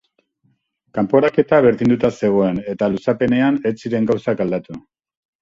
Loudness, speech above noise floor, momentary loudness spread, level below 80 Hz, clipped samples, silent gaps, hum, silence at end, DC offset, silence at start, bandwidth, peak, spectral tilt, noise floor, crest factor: -17 LUFS; 47 dB; 9 LU; -52 dBFS; under 0.1%; none; none; 0.6 s; under 0.1%; 0.95 s; 7.6 kHz; 0 dBFS; -8 dB/octave; -64 dBFS; 18 dB